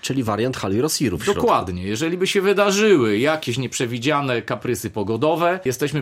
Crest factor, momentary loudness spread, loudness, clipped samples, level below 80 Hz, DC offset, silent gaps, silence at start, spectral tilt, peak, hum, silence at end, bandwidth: 16 dB; 8 LU; -20 LUFS; under 0.1%; -52 dBFS; under 0.1%; none; 0.05 s; -4.5 dB/octave; -2 dBFS; none; 0 s; 16 kHz